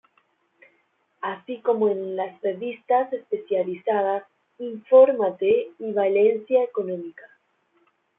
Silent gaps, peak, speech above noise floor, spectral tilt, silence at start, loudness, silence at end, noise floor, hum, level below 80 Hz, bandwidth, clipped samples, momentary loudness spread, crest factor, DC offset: none; -4 dBFS; 45 dB; -9.5 dB/octave; 1.2 s; -23 LUFS; 0.95 s; -68 dBFS; none; -76 dBFS; 3.8 kHz; under 0.1%; 14 LU; 18 dB; under 0.1%